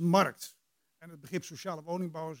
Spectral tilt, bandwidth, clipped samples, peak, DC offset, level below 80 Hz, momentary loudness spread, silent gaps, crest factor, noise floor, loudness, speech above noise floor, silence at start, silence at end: -5.5 dB/octave; 17 kHz; under 0.1%; -12 dBFS; under 0.1%; -82 dBFS; 21 LU; none; 22 dB; -62 dBFS; -34 LUFS; 29 dB; 0 s; 0 s